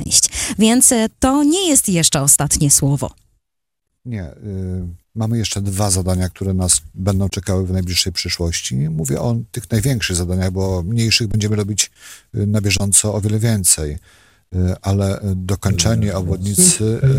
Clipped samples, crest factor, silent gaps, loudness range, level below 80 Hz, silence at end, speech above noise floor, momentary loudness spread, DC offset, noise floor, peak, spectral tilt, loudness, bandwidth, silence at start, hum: under 0.1%; 18 dB; none; 6 LU; -36 dBFS; 0 s; 63 dB; 13 LU; under 0.1%; -79 dBFS; 0 dBFS; -4 dB/octave; -16 LUFS; 16.5 kHz; 0 s; none